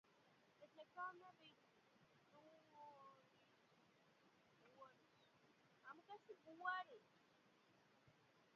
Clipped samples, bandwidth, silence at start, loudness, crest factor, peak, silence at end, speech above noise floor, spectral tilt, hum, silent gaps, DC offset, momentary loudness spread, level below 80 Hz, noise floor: under 0.1%; 6.8 kHz; 0.05 s; -56 LUFS; 28 dB; -34 dBFS; 0 s; 23 dB; -0.5 dB/octave; none; none; under 0.1%; 20 LU; under -90 dBFS; -77 dBFS